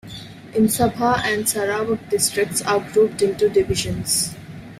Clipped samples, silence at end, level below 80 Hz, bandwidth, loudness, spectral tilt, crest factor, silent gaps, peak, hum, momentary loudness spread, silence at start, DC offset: under 0.1%; 0 s; -46 dBFS; 16 kHz; -20 LUFS; -3.5 dB/octave; 16 dB; none; -4 dBFS; none; 7 LU; 0.05 s; under 0.1%